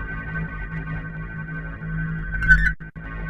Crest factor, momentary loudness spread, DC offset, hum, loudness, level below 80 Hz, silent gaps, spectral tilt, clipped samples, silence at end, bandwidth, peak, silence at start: 22 dB; 15 LU; under 0.1%; none; -24 LUFS; -30 dBFS; none; -7 dB/octave; under 0.1%; 0 s; 8 kHz; -2 dBFS; 0 s